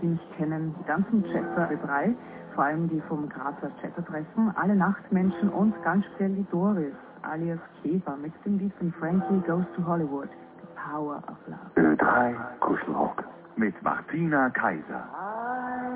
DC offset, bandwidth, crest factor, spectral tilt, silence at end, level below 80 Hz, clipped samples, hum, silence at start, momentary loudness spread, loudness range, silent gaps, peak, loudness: under 0.1%; 4 kHz; 18 dB; -8 dB/octave; 0 s; -64 dBFS; under 0.1%; none; 0 s; 12 LU; 3 LU; none; -10 dBFS; -28 LUFS